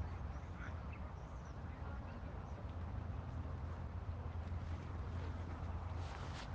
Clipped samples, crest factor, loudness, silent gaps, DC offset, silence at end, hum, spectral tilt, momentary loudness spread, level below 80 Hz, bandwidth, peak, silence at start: under 0.1%; 12 dB; -48 LUFS; none; under 0.1%; 0 s; none; -7.5 dB/octave; 4 LU; -52 dBFS; 7.8 kHz; -34 dBFS; 0 s